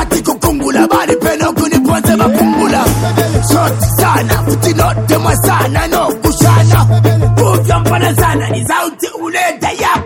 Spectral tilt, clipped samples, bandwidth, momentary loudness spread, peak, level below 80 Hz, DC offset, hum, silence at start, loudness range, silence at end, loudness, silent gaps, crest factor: -5.5 dB/octave; under 0.1%; 17.5 kHz; 5 LU; 0 dBFS; -26 dBFS; under 0.1%; none; 0 s; 1 LU; 0 s; -11 LUFS; none; 10 dB